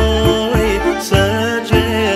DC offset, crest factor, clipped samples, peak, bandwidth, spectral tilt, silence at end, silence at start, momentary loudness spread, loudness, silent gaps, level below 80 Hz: under 0.1%; 14 dB; under 0.1%; 0 dBFS; 16 kHz; -5.5 dB/octave; 0 s; 0 s; 2 LU; -15 LUFS; none; -24 dBFS